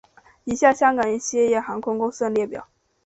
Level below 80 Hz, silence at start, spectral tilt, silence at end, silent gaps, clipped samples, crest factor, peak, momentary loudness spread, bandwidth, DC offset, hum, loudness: -58 dBFS; 0.45 s; -4 dB/octave; 0.4 s; none; under 0.1%; 18 dB; -4 dBFS; 13 LU; 8.4 kHz; under 0.1%; none; -21 LUFS